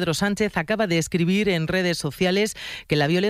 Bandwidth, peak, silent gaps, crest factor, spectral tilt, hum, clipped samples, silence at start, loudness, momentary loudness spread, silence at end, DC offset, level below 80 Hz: 15.5 kHz; -8 dBFS; none; 14 dB; -5 dB/octave; none; under 0.1%; 0 s; -22 LUFS; 4 LU; 0 s; under 0.1%; -50 dBFS